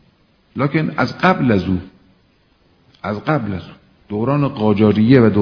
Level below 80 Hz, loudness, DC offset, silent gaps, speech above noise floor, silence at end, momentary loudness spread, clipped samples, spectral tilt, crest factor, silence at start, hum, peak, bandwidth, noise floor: -48 dBFS; -17 LUFS; under 0.1%; none; 41 dB; 0 s; 16 LU; under 0.1%; -9 dB/octave; 18 dB; 0.55 s; none; 0 dBFS; 5.4 kHz; -56 dBFS